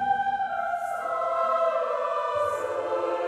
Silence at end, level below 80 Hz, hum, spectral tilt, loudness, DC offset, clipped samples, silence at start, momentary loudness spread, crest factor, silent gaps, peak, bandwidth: 0 s; -66 dBFS; none; -4 dB/octave; -27 LUFS; under 0.1%; under 0.1%; 0 s; 5 LU; 12 dB; none; -14 dBFS; 14.5 kHz